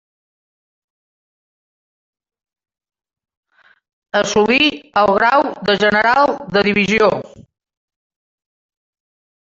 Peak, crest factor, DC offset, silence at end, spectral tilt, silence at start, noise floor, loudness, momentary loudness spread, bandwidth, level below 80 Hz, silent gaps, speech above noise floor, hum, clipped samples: 0 dBFS; 18 dB; under 0.1%; 2.05 s; -4 dB/octave; 4.15 s; under -90 dBFS; -14 LUFS; 5 LU; 7.8 kHz; -54 dBFS; none; over 76 dB; none; under 0.1%